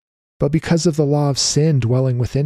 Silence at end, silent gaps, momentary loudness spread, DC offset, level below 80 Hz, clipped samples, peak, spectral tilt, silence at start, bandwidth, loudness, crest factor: 0 s; none; 4 LU; under 0.1%; -42 dBFS; under 0.1%; -4 dBFS; -5.5 dB/octave; 0.4 s; 12.5 kHz; -17 LUFS; 12 dB